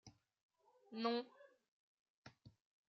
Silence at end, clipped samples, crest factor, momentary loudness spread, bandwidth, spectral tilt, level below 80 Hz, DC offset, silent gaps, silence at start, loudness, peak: 0.4 s; under 0.1%; 22 dB; 24 LU; 6.6 kHz; -2.5 dB/octave; -88 dBFS; under 0.1%; 0.43-0.49 s, 1.68-2.23 s; 0.05 s; -44 LUFS; -28 dBFS